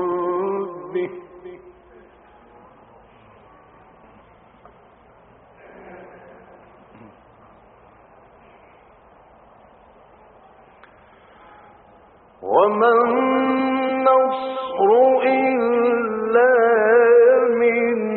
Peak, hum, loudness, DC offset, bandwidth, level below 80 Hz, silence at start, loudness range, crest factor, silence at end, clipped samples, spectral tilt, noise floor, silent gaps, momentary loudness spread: -4 dBFS; none; -17 LUFS; under 0.1%; 4.2 kHz; -64 dBFS; 0 s; 15 LU; 18 dB; 0 s; under 0.1%; -3.5 dB/octave; -50 dBFS; none; 16 LU